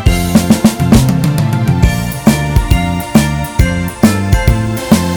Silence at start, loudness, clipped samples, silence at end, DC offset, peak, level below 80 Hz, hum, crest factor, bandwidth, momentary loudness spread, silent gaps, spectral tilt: 0 s; -12 LUFS; 1%; 0 s; under 0.1%; 0 dBFS; -18 dBFS; none; 10 dB; over 20 kHz; 4 LU; none; -6 dB/octave